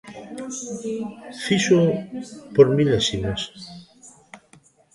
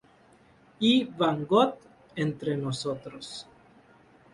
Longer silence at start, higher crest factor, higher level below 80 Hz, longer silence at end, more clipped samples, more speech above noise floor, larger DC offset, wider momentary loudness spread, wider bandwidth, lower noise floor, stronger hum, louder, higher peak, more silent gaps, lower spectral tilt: second, 0.05 s vs 0.8 s; about the same, 22 dB vs 20 dB; first, -50 dBFS vs -66 dBFS; second, 0.6 s vs 0.9 s; neither; about the same, 33 dB vs 32 dB; neither; about the same, 19 LU vs 17 LU; about the same, 11.5 kHz vs 11.5 kHz; second, -55 dBFS vs -59 dBFS; neither; first, -21 LUFS vs -27 LUFS; first, -2 dBFS vs -8 dBFS; neither; about the same, -5 dB/octave vs -5.5 dB/octave